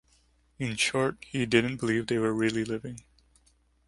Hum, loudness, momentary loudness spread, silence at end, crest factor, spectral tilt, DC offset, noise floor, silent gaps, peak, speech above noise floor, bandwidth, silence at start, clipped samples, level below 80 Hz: none; -28 LUFS; 11 LU; 0.9 s; 24 dB; -4.5 dB/octave; under 0.1%; -66 dBFS; none; -6 dBFS; 38 dB; 11.5 kHz; 0.6 s; under 0.1%; -60 dBFS